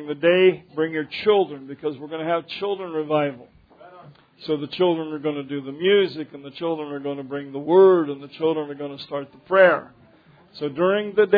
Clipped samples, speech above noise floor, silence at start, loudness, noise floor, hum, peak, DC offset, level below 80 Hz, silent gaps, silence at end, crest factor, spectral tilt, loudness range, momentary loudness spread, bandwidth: under 0.1%; 32 dB; 0 s; -22 LUFS; -53 dBFS; none; -2 dBFS; under 0.1%; -70 dBFS; none; 0 s; 20 dB; -8.5 dB/octave; 6 LU; 15 LU; 5 kHz